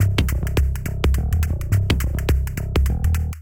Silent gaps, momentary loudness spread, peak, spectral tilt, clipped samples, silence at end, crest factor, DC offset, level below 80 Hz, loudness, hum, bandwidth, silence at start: none; 3 LU; -6 dBFS; -6 dB/octave; under 0.1%; 0 s; 14 dB; 0.3%; -22 dBFS; -22 LUFS; none; 17 kHz; 0 s